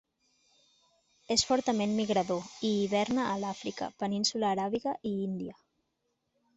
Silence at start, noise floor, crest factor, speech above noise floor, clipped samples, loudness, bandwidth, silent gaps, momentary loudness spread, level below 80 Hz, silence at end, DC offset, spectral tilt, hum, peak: 1.3 s; -80 dBFS; 20 dB; 49 dB; under 0.1%; -31 LUFS; 8.2 kHz; none; 8 LU; -66 dBFS; 1.05 s; under 0.1%; -4 dB/octave; none; -12 dBFS